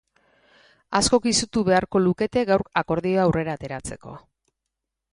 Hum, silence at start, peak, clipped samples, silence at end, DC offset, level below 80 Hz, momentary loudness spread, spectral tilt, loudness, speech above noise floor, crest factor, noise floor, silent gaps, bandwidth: none; 0.9 s; -4 dBFS; under 0.1%; 0.95 s; under 0.1%; -48 dBFS; 14 LU; -4.5 dB/octave; -22 LUFS; 61 dB; 20 dB; -83 dBFS; none; 11.5 kHz